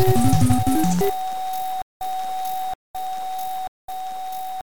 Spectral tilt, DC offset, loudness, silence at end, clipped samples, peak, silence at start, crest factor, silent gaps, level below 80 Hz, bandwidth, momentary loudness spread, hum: -6 dB/octave; under 0.1%; -24 LUFS; 0.05 s; under 0.1%; -4 dBFS; 0 s; 18 dB; 1.82-2.00 s, 2.75-2.94 s, 3.68-3.88 s; -40 dBFS; 18 kHz; 13 LU; none